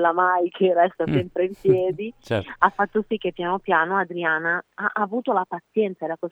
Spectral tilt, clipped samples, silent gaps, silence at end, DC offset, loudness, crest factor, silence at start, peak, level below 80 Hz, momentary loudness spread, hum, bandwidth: -7.5 dB/octave; under 0.1%; none; 0 s; under 0.1%; -23 LUFS; 22 dB; 0 s; -2 dBFS; -58 dBFS; 7 LU; none; 7.4 kHz